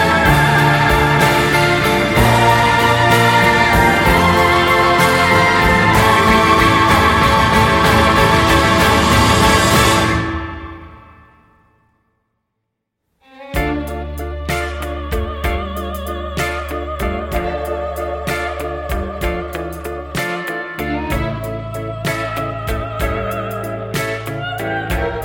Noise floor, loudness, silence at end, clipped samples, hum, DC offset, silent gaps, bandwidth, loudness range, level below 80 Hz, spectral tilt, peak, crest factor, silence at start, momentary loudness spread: -75 dBFS; -14 LUFS; 0 s; under 0.1%; none; under 0.1%; none; 17 kHz; 13 LU; -28 dBFS; -4.5 dB/octave; 0 dBFS; 14 dB; 0 s; 13 LU